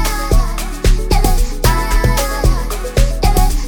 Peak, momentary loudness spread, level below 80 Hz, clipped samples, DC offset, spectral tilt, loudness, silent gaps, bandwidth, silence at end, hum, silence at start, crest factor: 0 dBFS; 3 LU; -14 dBFS; under 0.1%; under 0.1%; -4.5 dB/octave; -16 LUFS; none; 19.5 kHz; 0 s; none; 0 s; 12 dB